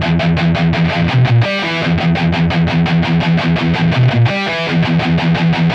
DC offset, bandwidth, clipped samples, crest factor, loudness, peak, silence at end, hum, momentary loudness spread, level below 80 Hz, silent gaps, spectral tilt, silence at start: under 0.1%; 7.2 kHz; under 0.1%; 10 dB; -13 LUFS; -2 dBFS; 0 s; none; 3 LU; -34 dBFS; none; -7.5 dB/octave; 0 s